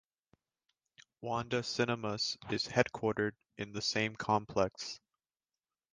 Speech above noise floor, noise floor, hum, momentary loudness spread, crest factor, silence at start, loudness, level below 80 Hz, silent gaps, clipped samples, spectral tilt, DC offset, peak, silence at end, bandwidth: over 55 dB; under -90 dBFS; none; 12 LU; 26 dB; 1 s; -35 LUFS; -66 dBFS; none; under 0.1%; -4 dB/octave; under 0.1%; -12 dBFS; 0.95 s; 10 kHz